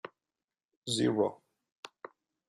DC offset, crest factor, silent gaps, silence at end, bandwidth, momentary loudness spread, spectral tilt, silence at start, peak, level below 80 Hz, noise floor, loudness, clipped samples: under 0.1%; 22 dB; 0.44-0.48 s, 0.76-0.82 s, 1.72-1.83 s; 0.6 s; 12.5 kHz; 22 LU; -4.5 dB/octave; 0.05 s; -14 dBFS; -74 dBFS; under -90 dBFS; -31 LUFS; under 0.1%